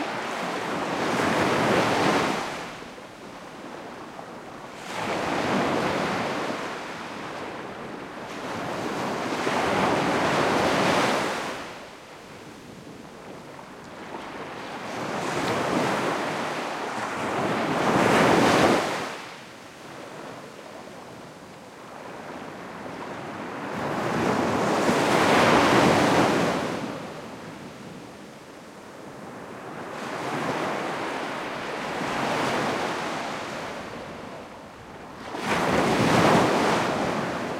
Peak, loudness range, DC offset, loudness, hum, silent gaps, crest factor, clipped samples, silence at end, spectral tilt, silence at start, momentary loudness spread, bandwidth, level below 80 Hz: -6 dBFS; 15 LU; under 0.1%; -25 LUFS; none; none; 20 dB; under 0.1%; 0 s; -4.5 dB/octave; 0 s; 22 LU; 16.5 kHz; -58 dBFS